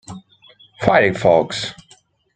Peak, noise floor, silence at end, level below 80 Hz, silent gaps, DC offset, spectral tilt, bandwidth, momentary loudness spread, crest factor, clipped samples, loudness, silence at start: -2 dBFS; -53 dBFS; 0.65 s; -52 dBFS; none; under 0.1%; -5 dB/octave; 9.4 kHz; 21 LU; 18 dB; under 0.1%; -16 LUFS; 0.1 s